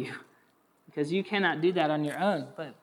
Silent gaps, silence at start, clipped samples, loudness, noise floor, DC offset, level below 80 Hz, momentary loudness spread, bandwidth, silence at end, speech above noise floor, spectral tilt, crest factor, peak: none; 0 s; under 0.1%; -29 LUFS; -67 dBFS; under 0.1%; -90 dBFS; 15 LU; 14 kHz; 0.1 s; 38 dB; -6 dB/octave; 18 dB; -12 dBFS